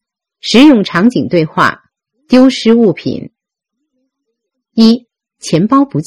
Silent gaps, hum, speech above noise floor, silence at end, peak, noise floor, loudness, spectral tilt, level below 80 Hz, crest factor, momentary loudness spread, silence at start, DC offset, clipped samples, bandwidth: none; none; 66 dB; 0.05 s; 0 dBFS; -74 dBFS; -10 LUFS; -5.5 dB/octave; -50 dBFS; 12 dB; 14 LU; 0.45 s; under 0.1%; 1%; 11.5 kHz